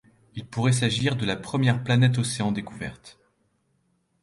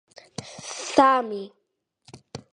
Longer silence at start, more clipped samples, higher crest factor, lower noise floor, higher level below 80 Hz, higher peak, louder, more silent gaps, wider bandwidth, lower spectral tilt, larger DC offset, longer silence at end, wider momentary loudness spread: about the same, 0.35 s vs 0.4 s; neither; second, 18 dB vs 24 dB; first, -70 dBFS vs -59 dBFS; first, -56 dBFS vs -66 dBFS; second, -8 dBFS vs -2 dBFS; second, -24 LUFS vs -21 LUFS; neither; about the same, 11.5 kHz vs 11 kHz; first, -5.5 dB/octave vs -3.5 dB/octave; neither; first, 1.1 s vs 0.15 s; second, 16 LU vs 24 LU